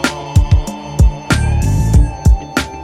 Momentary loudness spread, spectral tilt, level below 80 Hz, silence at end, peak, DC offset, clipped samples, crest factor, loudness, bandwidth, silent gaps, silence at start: 4 LU; -6 dB/octave; -16 dBFS; 0 s; 0 dBFS; under 0.1%; under 0.1%; 12 dB; -14 LUFS; 14 kHz; none; 0 s